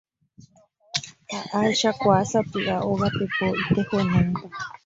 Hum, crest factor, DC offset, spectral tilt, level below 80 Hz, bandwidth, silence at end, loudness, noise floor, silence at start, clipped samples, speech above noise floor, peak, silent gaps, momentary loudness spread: none; 18 dB; under 0.1%; -5.5 dB/octave; -50 dBFS; 8 kHz; 0.1 s; -24 LUFS; -56 dBFS; 0.95 s; under 0.1%; 33 dB; -6 dBFS; none; 9 LU